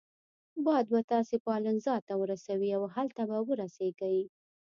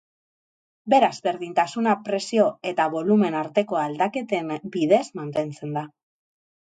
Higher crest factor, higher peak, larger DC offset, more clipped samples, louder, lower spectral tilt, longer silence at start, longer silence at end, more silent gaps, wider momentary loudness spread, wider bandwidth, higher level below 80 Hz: about the same, 16 dB vs 18 dB; second, -16 dBFS vs -6 dBFS; neither; neither; second, -32 LUFS vs -23 LUFS; about the same, -7 dB/octave vs -6 dB/octave; second, 0.55 s vs 0.85 s; second, 0.4 s vs 0.8 s; first, 1.04-1.08 s, 1.40-1.45 s, 2.02-2.07 s vs none; second, 6 LU vs 9 LU; second, 7.4 kHz vs 9.2 kHz; second, -80 dBFS vs -72 dBFS